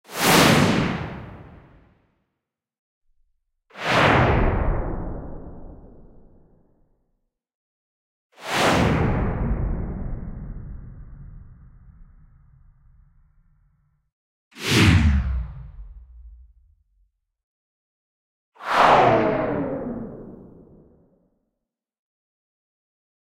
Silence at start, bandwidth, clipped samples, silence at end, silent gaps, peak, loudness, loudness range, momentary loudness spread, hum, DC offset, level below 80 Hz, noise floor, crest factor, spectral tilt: 0.1 s; 16 kHz; under 0.1%; 2.9 s; 2.79-3.01 s, 7.54-8.30 s, 14.12-14.51 s, 17.43-18.52 s; -4 dBFS; -20 LUFS; 15 LU; 25 LU; none; under 0.1%; -34 dBFS; -83 dBFS; 22 dB; -5 dB/octave